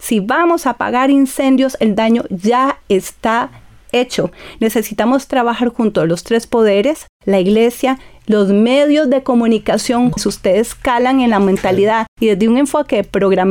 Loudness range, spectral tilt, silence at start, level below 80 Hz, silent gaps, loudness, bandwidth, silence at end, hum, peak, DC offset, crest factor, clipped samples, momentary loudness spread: 3 LU; -5.5 dB/octave; 0 s; -44 dBFS; 7.09-7.20 s, 12.08-12.17 s; -14 LUFS; 18.5 kHz; 0 s; none; -4 dBFS; under 0.1%; 10 dB; under 0.1%; 6 LU